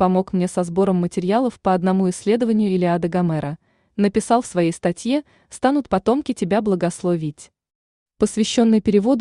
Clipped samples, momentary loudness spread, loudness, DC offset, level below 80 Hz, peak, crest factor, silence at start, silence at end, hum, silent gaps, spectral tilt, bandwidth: under 0.1%; 6 LU; -20 LUFS; under 0.1%; -52 dBFS; -4 dBFS; 14 dB; 0 s; 0 s; none; 7.75-8.06 s; -6.5 dB/octave; 11 kHz